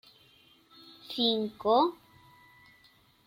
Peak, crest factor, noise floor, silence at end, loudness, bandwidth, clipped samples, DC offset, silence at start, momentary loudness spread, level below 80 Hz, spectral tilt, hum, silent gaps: -12 dBFS; 20 dB; -63 dBFS; 1.35 s; -28 LUFS; 16.5 kHz; under 0.1%; under 0.1%; 1.1 s; 13 LU; -74 dBFS; -6 dB/octave; none; none